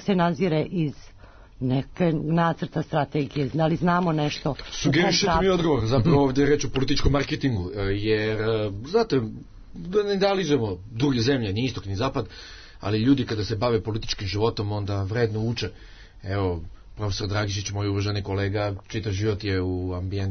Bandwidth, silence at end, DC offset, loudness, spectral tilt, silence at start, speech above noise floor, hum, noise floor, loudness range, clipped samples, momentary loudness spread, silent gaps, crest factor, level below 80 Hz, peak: 6.6 kHz; 0 s; under 0.1%; -25 LUFS; -6 dB/octave; 0 s; 24 dB; none; -47 dBFS; 6 LU; under 0.1%; 9 LU; none; 16 dB; -40 dBFS; -8 dBFS